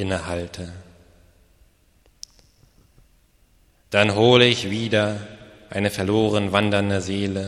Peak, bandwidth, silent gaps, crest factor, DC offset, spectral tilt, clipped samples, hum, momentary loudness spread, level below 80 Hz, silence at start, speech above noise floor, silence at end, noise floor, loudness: 0 dBFS; 13.5 kHz; none; 22 dB; under 0.1%; -5 dB/octave; under 0.1%; none; 24 LU; -52 dBFS; 0 s; 38 dB; 0 s; -59 dBFS; -20 LUFS